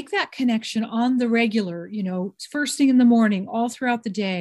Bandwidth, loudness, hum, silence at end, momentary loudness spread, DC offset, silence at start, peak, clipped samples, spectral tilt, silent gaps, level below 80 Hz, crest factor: 12.5 kHz; -22 LUFS; none; 0 s; 11 LU; under 0.1%; 0 s; -8 dBFS; under 0.1%; -5 dB/octave; none; -70 dBFS; 14 dB